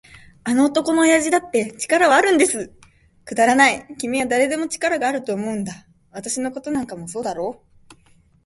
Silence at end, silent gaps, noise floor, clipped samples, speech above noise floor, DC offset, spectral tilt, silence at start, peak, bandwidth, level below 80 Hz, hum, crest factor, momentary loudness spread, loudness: 0.5 s; none; -55 dBFS; under 0.1%; 36 dB; under 0.1%; -3 dB/octave; 0.45 s; -2 dBFS; 12 kHz; -58 dBFS; none; 20 dB; 15 LU; -19 LUFS